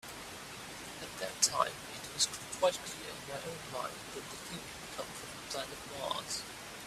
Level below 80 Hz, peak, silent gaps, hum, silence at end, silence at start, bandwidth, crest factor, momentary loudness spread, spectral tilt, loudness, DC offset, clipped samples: -66 dBFS; -12 dBFS; none; none; 0 s; 0.05 s; 16 kHz; 26 dB; 13 LU; -1.5 dB/octave; -37 LUFS; under 0.1%; under 0.1%